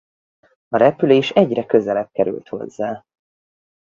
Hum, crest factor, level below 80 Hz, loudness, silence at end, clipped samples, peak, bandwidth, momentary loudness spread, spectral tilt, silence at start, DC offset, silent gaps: none; 20 dB; -60 dBFS; -18 LUFS; 0.95 s; under 0.1%; 0 dBFS; 7.4 kHz; 13 LU; -7 dB/octave; 0.7 s; under 0.1%; none